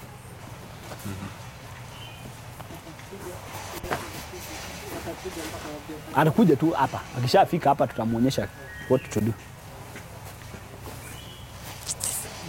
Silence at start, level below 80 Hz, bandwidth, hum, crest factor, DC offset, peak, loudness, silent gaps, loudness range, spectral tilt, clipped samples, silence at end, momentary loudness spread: 0 s; -50 dBFS; 16.5 kHz; none; 24 dB; under 0.1%; -4 dBFS; -26 LUFS; none; 14 LU; -5 dB/octave; under 0.1%; 0 s; 20 LU